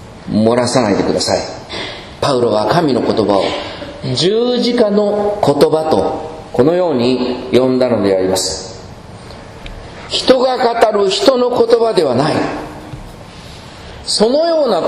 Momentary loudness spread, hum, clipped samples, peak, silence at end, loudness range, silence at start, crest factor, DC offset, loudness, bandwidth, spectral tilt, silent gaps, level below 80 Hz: 20 LU; none; 0.1%; 0 dBFS; 0 s; 3 LU; 0 s; 14 dB; under 0.1%; -14 LUFS; 14 kHz; -5 dB/octave; none; -42 dBFS